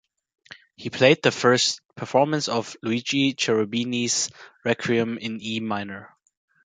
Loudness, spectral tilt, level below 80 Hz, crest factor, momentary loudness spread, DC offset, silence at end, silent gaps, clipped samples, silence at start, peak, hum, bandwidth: -23 LUFS; -3.5 dB/octave; -66 dBFS; 22 dB; 12 LU; under 0.1%; 0.6 s; 1.85-1.89 s; under 0.1%; 0.8 s; -2 dBFS; none; 9.6 kHz